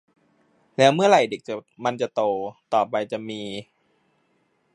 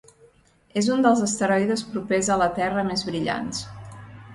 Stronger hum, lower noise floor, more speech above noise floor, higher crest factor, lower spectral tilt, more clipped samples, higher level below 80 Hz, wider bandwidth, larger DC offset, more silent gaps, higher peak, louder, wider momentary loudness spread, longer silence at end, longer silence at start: neither; first, -68 dBFS vs -57 dBFS; first, 45 dB vs 34 dB; about the same, 22 dB vs 18 dB; about the same, -5 dB/octave vs -4.5 dB/octave; neither; second, -72 dBFS vs -54 dBFS; about the same, 11 kHz vs 11.5 kHz; neither; neither; first, -2 dBFS vs -6 dBFS; about the same, -22 LUFS vs -23 LUFS; about the same, 17 LU vs 16 LU; first, 1.1 s vs 0 s; about the same, 0.8 s vs 0.75 s